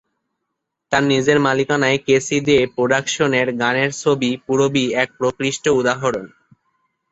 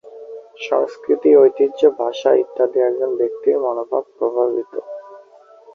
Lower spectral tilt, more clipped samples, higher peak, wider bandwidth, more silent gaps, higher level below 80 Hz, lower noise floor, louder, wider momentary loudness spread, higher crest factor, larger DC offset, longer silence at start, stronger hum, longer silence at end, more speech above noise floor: about the same, -4.5 dB/octave vs -5.5 dB/octave; neither; about the same, -2 dBFS vs -2 dBFS; first, 8.2 kHz vs 6.6 kHz; neither; first, -54 dBFS vs -68 dBFS; first, -78 dBFS vs -46 dBFS; about the same, -17 LUFS vs -17 LUFS; second, 5 LU vs 19 LU; about the same, 16 dB vs 16 dB; neither; first, 0.9 s vs 0.05 s; neither; first, 0.85 s vs 0.55 s; first, 60 dB vs 29 dB